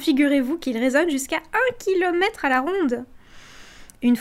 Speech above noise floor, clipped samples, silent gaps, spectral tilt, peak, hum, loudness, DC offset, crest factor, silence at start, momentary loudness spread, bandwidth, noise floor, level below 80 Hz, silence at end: 23 dB; under 0.1%; none; -3.5 dB/octave; -6 dBFS; none; -22 LUFS; under 0.1%; 16 dB; 0 s; 6 LU; 15.5 kHz; -44 dBFS; -52 dBFS; 0 s